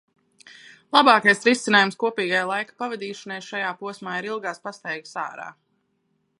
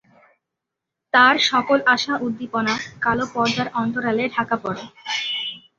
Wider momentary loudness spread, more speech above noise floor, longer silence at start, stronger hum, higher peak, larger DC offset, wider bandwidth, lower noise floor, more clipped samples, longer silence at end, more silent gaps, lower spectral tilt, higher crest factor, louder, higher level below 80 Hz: first, 17 LU vs 11 LU; second, 48 dB vs 63 dB; second, 0.9 s vs 1.15 s; neither; about the same, -2 dBFS vs -2 dBFS; neither; first, 11.5 kHz vs 7.8 kHz; second, -71 dBFS vs -83 dBFS; neither; first, 0.9 s vs 0.2 s; neither; about the same, -3.5 dB/octave vs -3.5 dB/octave; about the same, 22 dB vs 20 dB; about the same, -22 LUFS vs -20 LUFS; second, -78 dBFS vs -58 dBFS